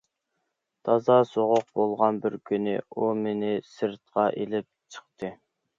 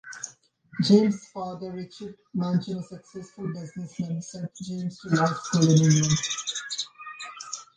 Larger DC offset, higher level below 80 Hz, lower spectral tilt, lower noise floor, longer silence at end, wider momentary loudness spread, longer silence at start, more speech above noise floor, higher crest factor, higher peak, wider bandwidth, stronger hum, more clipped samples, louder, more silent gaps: neither; second, -72 dBFS vs -62 dBFS; first, -7 dB/octave vs -5 dB/octave; first, -80 dBFS vs -52 dBFS; first, 0.45 s vs 0.15 s; about the same, 17 LU vs 19 LU; first, 0.85 s vs 0.05 s; first, 54 dB vs 27 dB; about the same, 20 dB vs 20 dB; about the same, -6 dBFS vs -6 dBFS; second, 7.6 kHz vs 9.8 kHz; neither; neither; about the same, -26 LUFS vs -26 LUFS; neither